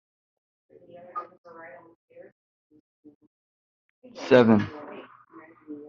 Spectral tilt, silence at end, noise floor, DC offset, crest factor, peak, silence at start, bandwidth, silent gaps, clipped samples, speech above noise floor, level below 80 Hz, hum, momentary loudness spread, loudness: -5.5 dB/octave; 0.1 s; -52 dBFS; under 0.1%; 26 dB; -4 dBFS; 1.15 s; 7.2 kHz; 1.38-1.44 s, 1.95-2.08 s, 2.32-2.70 s, 2.80-3.03 s, 3.15-3.21 s, 3.27-4.02 s; under 0.1%; 29 dB; -68 dBFS; none; 29 LU; -21 LUFS